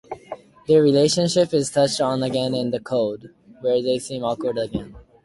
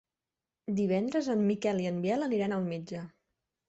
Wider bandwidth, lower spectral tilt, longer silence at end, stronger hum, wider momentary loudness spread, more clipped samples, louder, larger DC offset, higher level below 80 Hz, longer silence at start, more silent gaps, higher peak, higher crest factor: first, 11.5 kHz vs 8 kHz; second, -5 dB/octave vs -7 dB/octave; second, 0.25 s vs 0.6 s; neither; first, 16 LU vs 13 LU; neither; first, -21 LUFS vs -31 LUFS; neither; first, -54 dBFS vs -70 dBFS; second, 0.1 s vs 0.65 s; neither; first, -6 dBFS vs -18 dBFS; about the same, 16 dB vs 14 dB